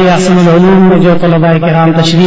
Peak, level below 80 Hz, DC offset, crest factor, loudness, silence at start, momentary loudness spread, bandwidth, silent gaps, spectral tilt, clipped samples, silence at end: 0 dBFS; -34 dBFS; under 0.1%; 6 dB; -6 LUFS; 0 s; 3 LU; 8 kHz; none; -7 dB/octave; 2%; 0 s